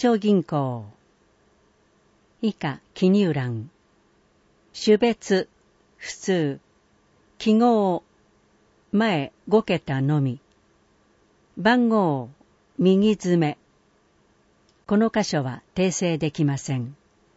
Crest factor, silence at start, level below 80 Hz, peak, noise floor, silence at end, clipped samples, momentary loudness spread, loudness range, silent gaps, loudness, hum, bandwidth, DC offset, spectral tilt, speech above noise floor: 18 dB; 0 s; -62 dBFS; -6 dBFS; -62 dBFS; 0.45 s; under 0.1%; 17 LU; 4 LU; none; -23 LUFS; none; 8 kHz; under 0.1%; -6 dB/octave; 40 dB